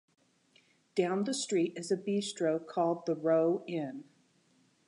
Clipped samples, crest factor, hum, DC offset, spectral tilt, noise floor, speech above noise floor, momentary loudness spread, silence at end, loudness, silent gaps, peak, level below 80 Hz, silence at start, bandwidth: under 0.1%; 16 dB; none; under 0.1%; -5 dB/octave; -69 dBFS; 38 dB; 9 LU; 0.85 s; -32 LUFS; none; -16 dBFS; -86 dBFS; 0.95 s; 11 kHz